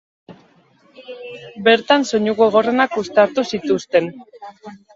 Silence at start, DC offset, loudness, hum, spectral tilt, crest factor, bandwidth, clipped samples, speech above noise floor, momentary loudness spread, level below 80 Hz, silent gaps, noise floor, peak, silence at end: 0.3 s; under 0.1%; -16 LUFS; none; -4.5 dB/octave; 18 dB; 7.8 kHz; under 0.1%; 36 dB; 21 LU; -62 dBFS; none; -54 dBFS; 0 dBFS; 0.2 s